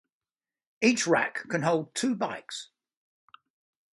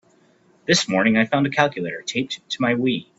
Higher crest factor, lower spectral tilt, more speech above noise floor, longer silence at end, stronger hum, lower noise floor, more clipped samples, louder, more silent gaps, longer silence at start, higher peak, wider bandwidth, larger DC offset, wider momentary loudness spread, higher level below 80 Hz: about the same, 22 dB vs 22 dB; about the same, -4 dB/octave vs -4 dB/octave; first, over 63 dB vs 37 dB; first, 1.3 s vs 0.15 s; neither; first, under -90 dBFS vs -57 dBFS; neither; second, -27 LUFS vs -20 LUFS; neither; about the same, 0.8 s vs 0.7 s; second, -10 dBFS vs 0 dBFS; first, 11.5 kHz vs 8.2 kHz; neither; first, 13 LU vs 9 LU; second, -76 dBFS vs -60 dBFS